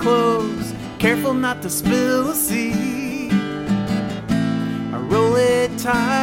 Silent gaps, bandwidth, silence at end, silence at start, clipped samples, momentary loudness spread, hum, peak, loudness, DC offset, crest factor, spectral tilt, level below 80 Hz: none; 17 kHz; 0 s; 0 s; under 0.1%; 7 LU; none; -4 dBFS; -20 LUFS; under 0.1%; 16 dB; -5 dB/octave; -44 dBFS